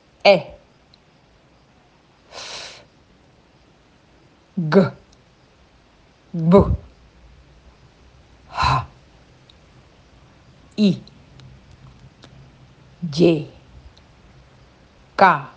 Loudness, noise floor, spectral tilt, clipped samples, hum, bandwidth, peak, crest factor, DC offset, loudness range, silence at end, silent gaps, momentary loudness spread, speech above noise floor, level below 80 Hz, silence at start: -19 LUFS; -54 dBFS; -7 dB/octave; under 0.1%; none; 8.8 kHz; 0 dBFS; 24 dB; under 0.1%; 15 LU; 0.1 s; none; 21 LU; 39 dB; -42 dBFS; 0.25 s